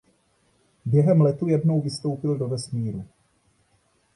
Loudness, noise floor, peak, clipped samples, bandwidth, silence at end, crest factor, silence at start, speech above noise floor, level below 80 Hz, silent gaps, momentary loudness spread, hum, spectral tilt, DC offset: -23 LUFS; -65 dBFS; -8 dBFS; under 0.1%; 11 kHz; 1.1 s; 16 dB; 0.85 s; 44 dB; -60 dBFS; none; 12 LU; none; -8 dB/octave; under 0.1%